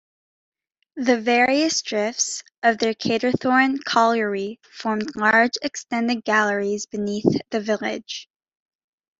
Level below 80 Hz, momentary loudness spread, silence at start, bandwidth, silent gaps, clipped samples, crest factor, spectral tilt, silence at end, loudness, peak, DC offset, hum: -66 dBFS; 10 LU; 0.95 s; 8.2 kHz; 2.58-2.62 s; under 0.1%; 20 dB; -3.5 dB/octave; 0.95 s; -21 LUFS; -2 dBFS; under 0.1%; none